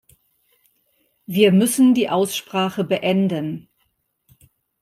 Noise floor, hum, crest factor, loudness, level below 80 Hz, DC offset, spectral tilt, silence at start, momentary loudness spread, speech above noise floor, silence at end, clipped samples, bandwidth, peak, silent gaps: -69 dBFS; none; 18 dB; -19 LUFS; -64 dBFS; under 0.1%; -5.5 dB/octave; 1.3 s; 12 LU; 51 dB; 1.2 s; under 0.1%; 16 kHz; -2 dBFS; none